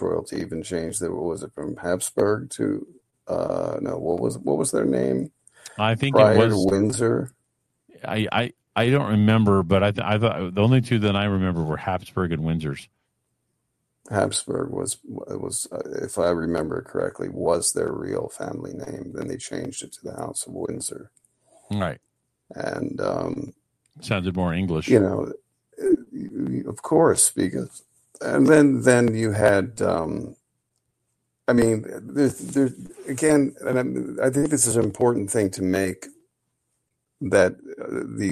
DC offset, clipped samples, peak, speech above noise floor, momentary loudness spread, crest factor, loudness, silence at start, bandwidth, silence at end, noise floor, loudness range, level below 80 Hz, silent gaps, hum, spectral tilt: under 0.1%; under 0.1%; -2 dBFS; 53 dB; 14 LU; 20 dB; -23 LUFS; 0 s; 13 kHz; 0 s; -76 dBFS; 9 LU; -54 dBFS; none; none; -5 dB/octave